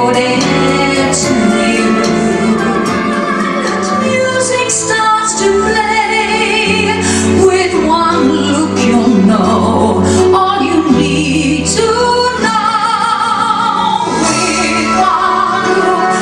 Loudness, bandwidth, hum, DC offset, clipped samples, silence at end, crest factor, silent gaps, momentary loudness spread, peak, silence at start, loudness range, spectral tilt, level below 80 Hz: -11 LUFS; 12 kHz; none; under 0.1%; under 0.1%; 0 s; 10 dB; none; 3 LU; 0 dBFS; 0 s; 2 LU; -4 dB/octave; -38 dBFS